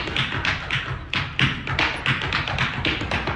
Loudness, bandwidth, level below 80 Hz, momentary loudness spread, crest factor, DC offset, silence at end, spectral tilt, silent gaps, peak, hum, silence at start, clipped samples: -23 LUFS; 10.5 kHz; -38 dBFS; 4 LU; 18 dB; under 0.1%; 0 s; -4.5 dB/octave; none; -6 dBFS; none; 0 s; under 0.1%